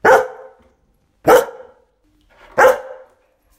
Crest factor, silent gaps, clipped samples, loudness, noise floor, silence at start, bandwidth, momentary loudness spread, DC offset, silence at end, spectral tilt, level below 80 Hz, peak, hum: 18 dB; none; under 0.1%; -14 LUFS; -61 dBFS; 0.05 s; 16.5 kHz; 16 LU; under 0.1%; 0.65 s; -3.5 dB/octave; -52 dBFS; 0 dBFS; none